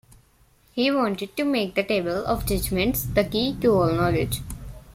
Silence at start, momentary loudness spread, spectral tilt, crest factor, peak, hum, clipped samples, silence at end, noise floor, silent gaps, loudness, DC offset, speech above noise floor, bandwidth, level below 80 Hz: 0.75 s; 8 LU; -5.5 dB/octave; 18 dB; -6 dBFS; none; under 0.1%; 0.05 s; -59 dBFS; none; -23 LUFS; under 0.1%; 36 dB; 16.5 kHz; -40 dBFS